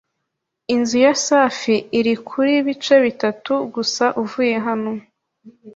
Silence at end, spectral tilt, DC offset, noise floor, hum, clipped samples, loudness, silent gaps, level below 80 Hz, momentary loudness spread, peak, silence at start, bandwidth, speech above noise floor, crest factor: 0.05 s; -3.5 dB/octave; under 0.1%; -77 dBFS; none; under 0.1%; -18 LUFS; none; -64 dBFS; 8 LU; -2 dBFS; 0.7 s; 7.8 kHz; 60 dB; 18 dB